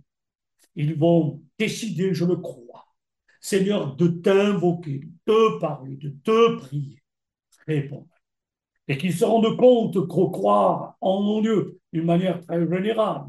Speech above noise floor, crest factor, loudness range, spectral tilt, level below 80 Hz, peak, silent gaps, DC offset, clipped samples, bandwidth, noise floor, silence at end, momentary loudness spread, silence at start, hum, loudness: 66 dB; 16 dB; 5 LU; -7 dB/octave; -70 dBFS; -6 dBFS; none; under 0.1%; under 0.1%; 12.5 kHz; -87 dBFS; 0 s; 14 LU; 0.75 s; none; -22 LUFS